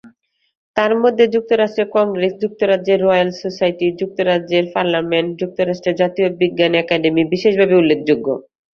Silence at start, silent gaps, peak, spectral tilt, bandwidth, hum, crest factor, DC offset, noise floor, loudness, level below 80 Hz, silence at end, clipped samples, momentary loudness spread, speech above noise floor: 0.05 s; 0.57-0.74 s; 0 dBFS; -6.5 dB/octave; 6.8 kHz; none; 16 dB; under 0.1%; -50 dBFS; -16 LUFS; -58 dBFS; 0.3 s; under 0.1%; 6 LU; 35 dB